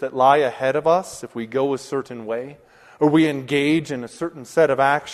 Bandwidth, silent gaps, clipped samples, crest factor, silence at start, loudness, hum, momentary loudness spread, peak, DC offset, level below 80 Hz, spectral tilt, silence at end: 13 kHz; none; under 0.1%; 18 dB; 0 s; -20 LUFS; none; 13 LU; -2 dBFS; under 0.1%; -62 dBFS; -5.5 dB/octave; 0 s